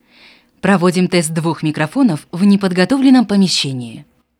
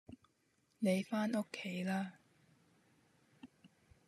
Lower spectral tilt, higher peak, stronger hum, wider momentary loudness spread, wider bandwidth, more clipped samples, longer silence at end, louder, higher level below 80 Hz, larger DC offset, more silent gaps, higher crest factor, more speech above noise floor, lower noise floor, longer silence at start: about the same, -5.5 dB/octave vs -6 dB/octave; first, 0 dBFS vs -22 dBFS; neither; about the same, 9 LU vs 9 LU; about the same, 14 kHz vs 13 kHz; neither; about the same, 0.4 s vs 0.4 s; first, -14 LUFS vs -39 LUFS; first, -56 dBFS vs -82 dBFS; neither; neither; second, 14 dB vs 20 dB; second, 33 dB vs 40 dB; second, -47 dBFS vs -77 dBFS; first, 0.65 s vs 0.1 s